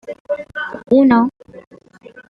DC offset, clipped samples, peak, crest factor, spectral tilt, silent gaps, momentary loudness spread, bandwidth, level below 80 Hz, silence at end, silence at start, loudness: under 0.1%; under 0.1%; -2 dBFS; 16 dB; -8 dB/octave; 0.20-0.25 s, 1.67-1.71 s; 14 LU; 4.9 kHz; -56 dBFS; 0.1 s; 0.05 s; -16 LUFS